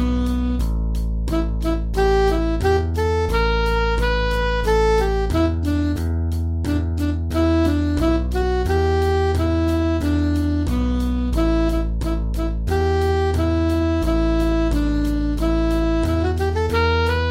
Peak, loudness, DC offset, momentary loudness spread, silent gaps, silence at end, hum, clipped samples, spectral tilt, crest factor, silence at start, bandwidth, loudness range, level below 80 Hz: -8 dBFS; -20 LUFS; under 0.1%; 5 LU; none; 0 s; none; under 0.1%; -7 dB/octave; 12 dB; 0 s; 15.5 kHz; 1 LU; -24 dBFS